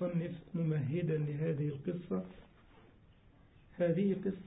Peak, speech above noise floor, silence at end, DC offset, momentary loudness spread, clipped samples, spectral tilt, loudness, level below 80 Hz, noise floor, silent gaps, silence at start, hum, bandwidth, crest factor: -22 dBFS; 27 dB; 0 s; under 0.1%; 8 LU; under 0.1%; -9 dB/octave; -36 LUFS; -66 dBFS; -63 dBFS; none; 0 s; none; 3.9 kHz; 16 dB